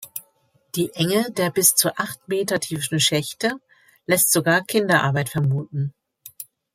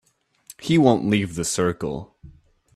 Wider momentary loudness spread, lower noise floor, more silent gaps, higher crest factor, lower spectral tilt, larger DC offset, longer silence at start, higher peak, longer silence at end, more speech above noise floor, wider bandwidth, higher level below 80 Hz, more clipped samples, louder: first, 19 LU vs 15 LU; first, -63 dBFS vs -50 dBFS; neither; about the same, 20 dB vs 20 dB; second, -3.5 dB/octave vs -5.5 dB/octave; neither; second, 0 s vs 0.6 s; about the same, -2 dBFS vs -2 dBFS; second, 0.3 s vs 0.45 s; first, 42 dB vs 29 dB; first, 16.5 kHz vs 14 kHz; second, -62 dBFS vs -52 dBFS; neither; about the same, -20 LUFS vs -21 LUFS